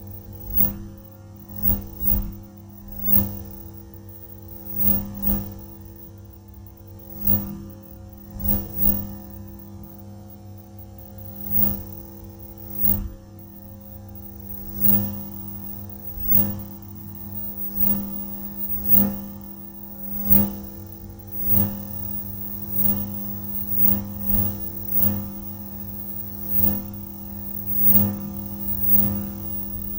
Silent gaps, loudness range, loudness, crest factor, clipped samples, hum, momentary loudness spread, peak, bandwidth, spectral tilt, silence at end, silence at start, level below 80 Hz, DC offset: none; 6 LU; -20 LUFS; 22 dB; under 0.1%; none; 24 LU; -4 dBFS; 16.5 kHz; -7.5 dB/octave; 0 s; 0 s; -40 dBFS; under 0.1%